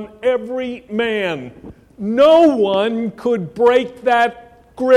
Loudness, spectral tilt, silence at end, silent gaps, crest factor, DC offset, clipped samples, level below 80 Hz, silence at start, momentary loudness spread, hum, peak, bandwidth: -16 LUFS; -6 dB/octave; 0 s; none; 14 dB; under 0.1%; under 0.1%; -54 dBFS; 0 s; 13 LU; none; -2 dBFS; 11.5 kHz